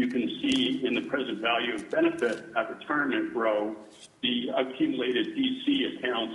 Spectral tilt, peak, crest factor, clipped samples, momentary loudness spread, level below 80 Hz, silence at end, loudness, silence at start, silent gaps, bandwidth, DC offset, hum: -4.5 dB/octave; -12 dBFS; 16 dB; under 0.1%; 5 LU; -70 dBFS; 0 s; -28 LUFS; 0 s; none; 11.5 kHz; under 0.1%; none